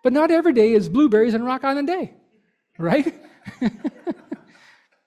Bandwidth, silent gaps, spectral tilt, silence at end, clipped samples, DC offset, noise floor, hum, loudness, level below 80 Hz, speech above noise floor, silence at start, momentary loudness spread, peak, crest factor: 12 kHz; none; -7.5 dB/octave; 0.7 s; under 0.1%; under 0.1%; -65 dBFS; none; -20 LUFS; -60 dBFS; 46 dB; 0.05 s; 16 LU; -4 dBFS; 16 dB